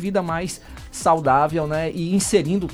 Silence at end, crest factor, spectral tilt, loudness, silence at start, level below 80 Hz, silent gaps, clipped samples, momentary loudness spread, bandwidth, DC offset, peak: 0 s; 16 dB; -5 dB/octave; -21 LUFS; 0 s; -44 dBFS; none; under 0.1%; 12 LU; 15.5 kHz; under 0.1%; -6 dBFS